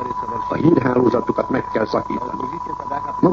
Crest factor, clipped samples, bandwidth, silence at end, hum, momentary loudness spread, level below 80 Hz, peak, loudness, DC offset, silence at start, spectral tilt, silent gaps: 18 dB; under 0.1%; 7.2 kHz; 0 s; none; 10 LU; -46 dBFS; 0 dBFS; -20 LUFS; under 0.1%; 0 s; -8.5 dB/octave; none